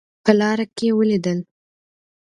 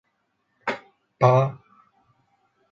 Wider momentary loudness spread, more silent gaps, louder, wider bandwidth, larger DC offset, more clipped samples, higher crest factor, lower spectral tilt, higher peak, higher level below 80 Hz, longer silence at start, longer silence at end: second, 7 LU vs 14 LU; neither; first, -19 LUFS vs -23 LUFS; first, 10.5 kHz vs 7.2 kHz; neither; neither; about the same, 20 dB vs 22 dB; second, -6.5 dB/octave vs -8 dB/octave; first, 0 dBFS vs -4 dBFS; about the same, -64 dBFS vs -66 dBFS; second, 0.25 s vs 0.65 s; second, 0.85 s vs 1.15 s